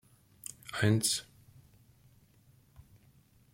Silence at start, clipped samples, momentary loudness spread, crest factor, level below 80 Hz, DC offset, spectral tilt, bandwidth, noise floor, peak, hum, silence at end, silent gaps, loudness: 0.65 s; under 0.1%; 19 LU; 24 dB; -68 dBFS; under 0.1%; -4 dB/octave; 16.5 kHz; -64 dBFS; -12 dBFS; none; 0.75 s; none; -31 LUFS